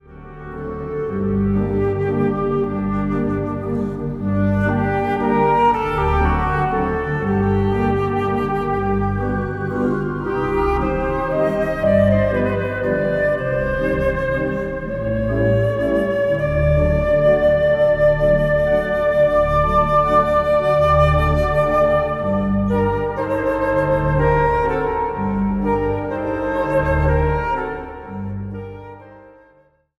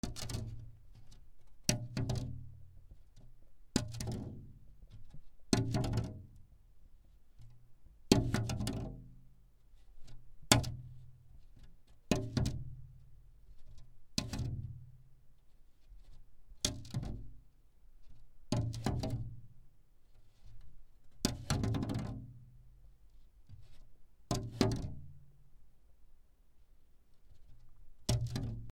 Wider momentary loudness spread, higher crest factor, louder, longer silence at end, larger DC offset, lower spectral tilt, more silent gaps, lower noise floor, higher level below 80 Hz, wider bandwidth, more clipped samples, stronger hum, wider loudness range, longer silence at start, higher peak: second, 8 LU vs 26 LU; second, 16 dB vs 34 dB; first, -18 LUFS vs -37 LUFS; first, 0.7 s vs 0 s; neither; first, -8.5 dB/octave vs -4.5 dB/octave; neither; second, -55 dBFS vs -61 dBFS; first, -30 dBFS vs -52 dBFS; second, 12 kHz vs 18 kHz; neither; neither; second, 5 LU vs 8 LU; about the same, 0.1 s vs 0.05 s; first, -2 dBFS vs -8 dBFS